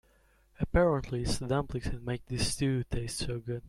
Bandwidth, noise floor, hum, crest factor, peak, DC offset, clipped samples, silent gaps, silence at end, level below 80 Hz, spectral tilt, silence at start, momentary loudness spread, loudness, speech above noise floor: 15.5 kHz; -65 dBFS; none; 20 dB; -12 dBFS; under 0.1%; under 0.1%; none; 0 s; -42 dBFS; -5.5 dB/octave; 0.6 s; 10 LU; -32 LUFS; 34 dB